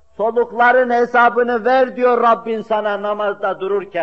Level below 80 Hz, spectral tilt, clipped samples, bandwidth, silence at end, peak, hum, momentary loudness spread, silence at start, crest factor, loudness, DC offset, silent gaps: -60 dBFS; -6 dB/octave; under 0.1%; 6.4 kHz; 0 s; -2 dBFS; none; 7 LU; 0.2 s; 12 dB; -16 LUFS; 0.4%; none